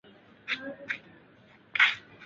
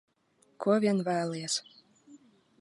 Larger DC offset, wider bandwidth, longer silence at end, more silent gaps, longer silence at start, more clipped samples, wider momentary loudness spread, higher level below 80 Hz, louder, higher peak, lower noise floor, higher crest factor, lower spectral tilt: neither; second, 7.8 kHz vs 11.5 kHz; second, 0 s vs 0.45 s; neither; second, 0.45 s vs 0.6 s; neither; first, 14 LU vs 7 LU; about the same, -76 dBFS vs -80 dBFS; about the same, -28 LUFS vs -30 LUFS; first, -10 dBFS vs -14 dBFS; second, -58 dBFS vs -69 dBFS; first, 24 dB vs 18 dB; second, -1.5 dB/octave vs -4.5 dB/octave